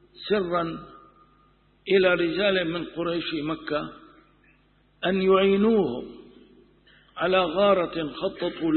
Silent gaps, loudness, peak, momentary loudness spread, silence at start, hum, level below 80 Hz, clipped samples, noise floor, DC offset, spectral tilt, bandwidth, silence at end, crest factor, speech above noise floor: none; -24 LUFS; -8 dBFS; 13 LU; 0.2 s; 50 Hz at -55 dBFS; -56 dBFS; under 0.1%; -62 dBFS; under 0.1%; -10 dB/octave; 4.4 kHz; 0 s; 18 dB; 38 dB